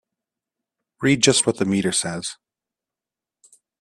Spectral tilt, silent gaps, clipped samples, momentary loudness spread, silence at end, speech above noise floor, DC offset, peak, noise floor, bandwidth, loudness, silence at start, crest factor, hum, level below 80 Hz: -3.5 dB/octave; none; under 0.1%; 13 LU; 1.5 s; 69 dB; under 0.1%; -2 dBFS; -89 dBFS; 13 kHz; -19 LUFS; 1 s; 22 dB; none; -60 dBFS